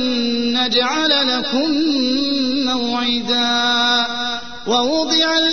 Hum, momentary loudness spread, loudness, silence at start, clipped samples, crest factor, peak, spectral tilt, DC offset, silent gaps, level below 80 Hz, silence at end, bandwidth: none; 4 LU; -16 LUFS; 0 s; under 0.1%; 14 dB; -4 dBFS; -2 dB/octave; 1%; none; -52 dBFS; 0 s; 6.6 kHz